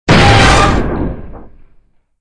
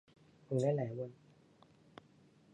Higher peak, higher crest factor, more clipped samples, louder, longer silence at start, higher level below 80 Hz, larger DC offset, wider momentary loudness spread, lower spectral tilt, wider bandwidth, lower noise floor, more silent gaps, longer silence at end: first, 0 dBFS vs -22 dBFS; second, 12 dB vs 20 dB; first, 0.4% vs under 0.1%; first, -9 LUFS vs -38 LUFS; second, 0.05 s vs 0.5 s; first, -20 dBFS vs -80 dBFS; neither; second, 16 LU vs 26 LU; second, -5 dB/octave vs -8.5 dB/octave; about the same, 10.5 kHz vs 10.5 kHz; second, -48 dBFS vs -66 dBFS; neither; second, 0.75 s vs 1.4 s